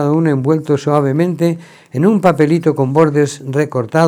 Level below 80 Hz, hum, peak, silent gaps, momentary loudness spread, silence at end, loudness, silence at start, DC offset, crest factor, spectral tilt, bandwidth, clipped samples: -60 dBFS; none; 0 dBFS; none; 6 LU; 0 s; -14 LUFS; 0 s; under 0.1%; 14 dB; -7.5 dB/octave; 15 kHz; under 0.1%